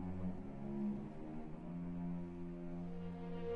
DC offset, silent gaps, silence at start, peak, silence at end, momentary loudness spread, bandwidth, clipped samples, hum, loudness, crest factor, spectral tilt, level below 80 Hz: under 0.1%; none; 0 s; -32 dBFS; 0 s; 6 LU; 5 kHz; under 0.1%; none; -46 LUFS; 12 dB; -10 dB/octave; -56 dBFS